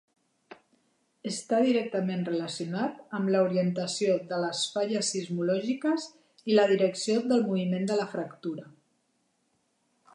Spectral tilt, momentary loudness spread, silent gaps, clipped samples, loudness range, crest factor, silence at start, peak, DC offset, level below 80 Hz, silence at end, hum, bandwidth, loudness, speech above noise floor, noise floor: -5 dB/octave; 11 LU; none; under 0.1%; 3 LU; 18 dB; 0.5 s; -12 dBFS; under 0.1%; -82 dBFS; 1.45 s; none; 11.5 kHz; -28 LUFS; 46 dB; -74 dBFS